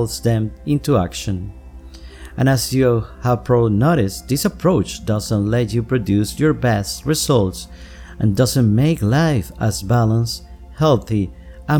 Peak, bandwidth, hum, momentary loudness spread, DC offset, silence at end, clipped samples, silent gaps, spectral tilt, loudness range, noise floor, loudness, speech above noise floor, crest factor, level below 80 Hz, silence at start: -2 dBFS; 18.5 kHz; none; 10 LU; under 0.1%; 0 s; under 0.1%; none; -6 dB/octave; 2 LU; -37 dBFS; -18 LUFS; 19 dB; 14 dB; -36 dBFS; 0 s